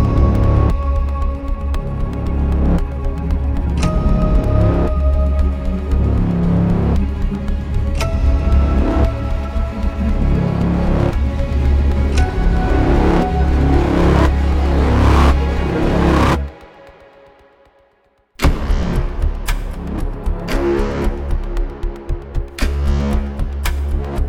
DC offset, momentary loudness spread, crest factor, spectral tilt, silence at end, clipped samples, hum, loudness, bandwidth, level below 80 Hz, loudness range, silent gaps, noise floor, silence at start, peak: under 0.1%; 9 LU; 14 dB; -7.5 dB/octave; 0 s; under 0.1%; none; -18 LUFS; 12.5 kHz; -18 dBFS; 7 LU; none; -57 dBFS; 0 s; 0 dBFS